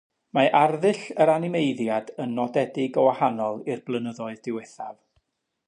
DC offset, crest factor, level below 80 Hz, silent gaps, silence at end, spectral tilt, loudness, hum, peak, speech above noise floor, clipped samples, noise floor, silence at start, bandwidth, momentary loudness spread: under 0.1%; 18 dB; -76 dBFS; none; 0.75 s; -6.5 dB/octave; -24 LUFS; none; -6 dBFS; 48 dB; under 0.1%; -72 dBFS; 0.35 s; 10.5 kHz; 13 LU